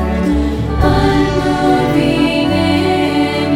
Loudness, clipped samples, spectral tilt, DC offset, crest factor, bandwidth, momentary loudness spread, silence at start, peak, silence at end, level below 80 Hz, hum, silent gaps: -13 LUFS; under 0.1%; -6.5 dB/octave; under 0.1%; 12 dB; 14.5 kHz; 3 LU; 0 s; 0 dBFS; 0 s; -24 dBFS; none; none